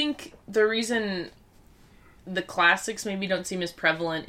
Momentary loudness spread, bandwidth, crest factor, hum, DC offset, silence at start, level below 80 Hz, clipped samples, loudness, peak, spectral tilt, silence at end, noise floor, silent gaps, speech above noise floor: 12 LU; 16 kHz; 20 dB; none; under 0.1%; 0 s; -60 dBFS; under 0.1%; -26 LUFS; -8 dBFS; -3.5 dB/octave; 0 s; -55 dBFS; none; 28 dB